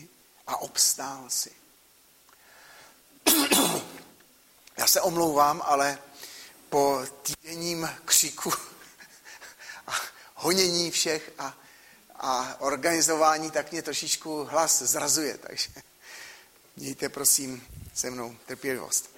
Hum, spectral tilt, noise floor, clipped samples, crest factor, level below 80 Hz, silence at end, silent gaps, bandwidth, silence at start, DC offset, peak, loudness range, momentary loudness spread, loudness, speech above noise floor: none; -1.5 dB/octave; -59 dBFS; under 0.1%; 22 dB; -64 dBFS; 0.1 s; none; 16.5 kHz; 0 s; under 0.1%; -6 dBFS; 4 LU; 21 LU; -25 LUFS; 32 dB